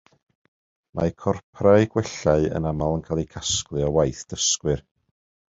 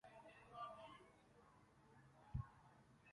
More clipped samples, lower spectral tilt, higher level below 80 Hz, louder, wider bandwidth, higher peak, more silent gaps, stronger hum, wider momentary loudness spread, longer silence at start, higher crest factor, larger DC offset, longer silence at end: neither; second, -4.5 dB/octave vs -7 dB/octave; first, -42 dBFS vs -66 dBFS; first, -23 LUFS vs -57 LUFS; second, 8 kHz vs 11 kHz; first, -2 dBFS vs -36 dBFS; first, 1.43-1.53 s vs none; neither; second, 9 LU vs 16 LU; first, 0.95 s vs 0.05 s; about the same, 22 dB vs 24 dB; neither; first, 0.75 s vs 0 s